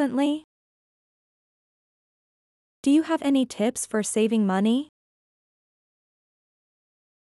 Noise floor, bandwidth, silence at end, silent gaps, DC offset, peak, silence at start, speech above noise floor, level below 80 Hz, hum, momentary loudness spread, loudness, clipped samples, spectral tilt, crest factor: under -90 dBFS; 13.5 kHz; 2.35 s; 0.44-2.83 s; under 0.1%; -12 dBFS; 0 s; over 67 dB; -74 dBFS; none; 6 LU; -24 LUFS; under 0.1%; -5 dB/octave; 16 dB